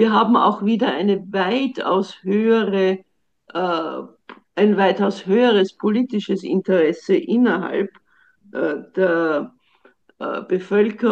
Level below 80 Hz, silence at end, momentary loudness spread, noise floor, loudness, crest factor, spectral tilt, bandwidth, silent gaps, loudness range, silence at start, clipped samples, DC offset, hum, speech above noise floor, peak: -70 dBFS; 0 s; 12 LU; -57 dBFS; -19 LUFS; 16 dB; -7 dB/octave; 8 kHz; none; 4 LU; 0 s; under 0.1%; under 0.1%; none; 38 dB; -4 dBFS